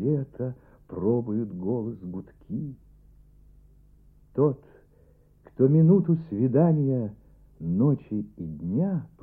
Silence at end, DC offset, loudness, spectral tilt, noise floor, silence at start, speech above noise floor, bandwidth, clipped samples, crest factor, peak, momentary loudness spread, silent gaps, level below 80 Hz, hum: 0.15 s; under 0.1%; -26 LUFS; -14 dB/octave; -58 dBFS; 0 s; 33 dB; 2.7 kHz; under 0.1%; 18 dB; -8 dBFS; 17 LU; none; -56 dBFS; 50 Hz at -50 dBFS